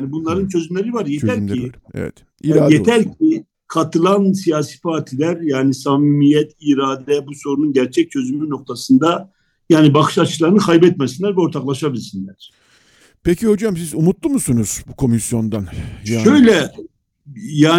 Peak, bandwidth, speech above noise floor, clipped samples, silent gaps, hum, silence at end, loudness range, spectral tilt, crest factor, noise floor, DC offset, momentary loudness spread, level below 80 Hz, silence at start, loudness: 0 dBFS; 16 kHz; 37 dB; under 0.1%; none; none; 0 s; 4 LU; -6 dB/octave; 16 dB; -52 dBFS; under 0.1%; 13 LU; -46 dBFS; 0 s; -16 LUFS